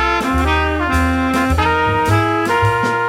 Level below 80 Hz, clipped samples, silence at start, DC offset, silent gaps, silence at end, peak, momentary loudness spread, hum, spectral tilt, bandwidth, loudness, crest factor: -26 dBFS; under 0.1%; 0 s; under 0.1%; none; 0 s; -2 dBFS; 1 LU; none; -6 dB/octave; 16 kHz; -15 LUFS; 12 dB